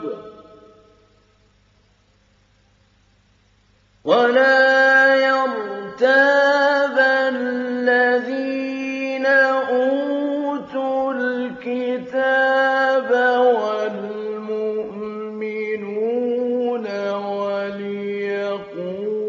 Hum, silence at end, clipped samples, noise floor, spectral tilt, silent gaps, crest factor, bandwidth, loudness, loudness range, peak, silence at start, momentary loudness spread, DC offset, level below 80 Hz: none; 0 s; under 0.1%; -58 dBFS; -5 dB/octave; none; 16 dB; 7.4 kHz; -19 LUFS; 8 LU; -2 dBFS; 0 s; 13 LU; under 0.1%; -68 dBFS